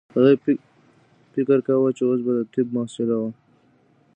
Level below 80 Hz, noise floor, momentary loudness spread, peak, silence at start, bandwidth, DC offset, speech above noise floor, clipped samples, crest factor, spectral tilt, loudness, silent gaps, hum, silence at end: -72 dBFS; -59 dBFS; 9 LU; -4 dBFS; 0.15 s; 9.2 kHz; under 0.1%; 39 dB; under 0.1%; 18 dB; -8 dB/octave; -22 LUFS; none; none; 0.85 s